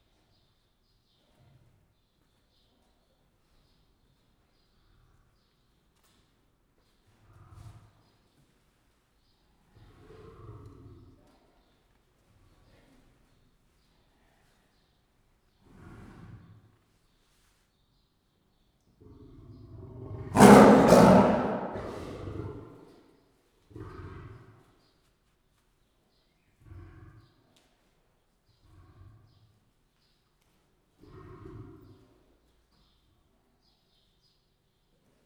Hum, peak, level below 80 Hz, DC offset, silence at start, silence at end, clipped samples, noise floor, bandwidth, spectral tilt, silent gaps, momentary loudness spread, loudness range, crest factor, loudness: none; -2 dBFS; -56 dBFS; under 0.1%; 20 s; 11.45 s; under 0.1%; -72 dBFS; over 20 kHz; -6.5 dB/octave; none; 35 LU; 26 LU; 30 dB; -20 LUFS